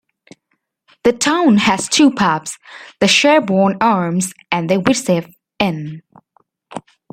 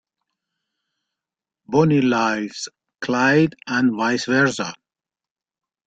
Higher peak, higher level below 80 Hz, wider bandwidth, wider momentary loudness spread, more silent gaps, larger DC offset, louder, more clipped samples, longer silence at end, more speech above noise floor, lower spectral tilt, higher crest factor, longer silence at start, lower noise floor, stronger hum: first, 0 dBFS vs -4 dBFS; first, -54 dBFS vs -60 dBFS; first, 15.5 kHz vs 9 kHz; first, 19 LU vs 13 LU; neither; neither; first, -15 LUFS vs -19 LUFS; neither; second, 0.3 s vs 1.15 s; second, 54 dB vs over 71 dB; second, -4 dB/octave vs -5.5 dB/octave; about the same, 16 dB vs 18 dB; second, 1.05 s vs 1.7 s; second, -69 dBFS vs under -90 dBFS; neither